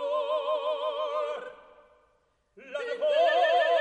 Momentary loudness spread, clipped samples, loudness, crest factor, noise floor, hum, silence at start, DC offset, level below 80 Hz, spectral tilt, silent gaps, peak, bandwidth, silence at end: 15 LU; under 0.1%; -27 LUFS; 14 dB; -70 dBFS; none; 0 s; under 0.1%; -78 dBFS; -1.5 dB/octave; none; -14 dBFS; 9.2 kHz; 0 s